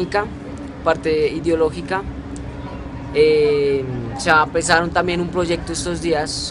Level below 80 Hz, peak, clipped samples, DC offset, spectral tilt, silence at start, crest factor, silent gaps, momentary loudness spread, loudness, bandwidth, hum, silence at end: -36 dBFS; 0 dBFS; under 0.1%; under 0.1%; -4.5 dB/octave; 0 s; 20 dB; none; 16 LU; -19 LUFS; 11.5 kHz; none; 0 s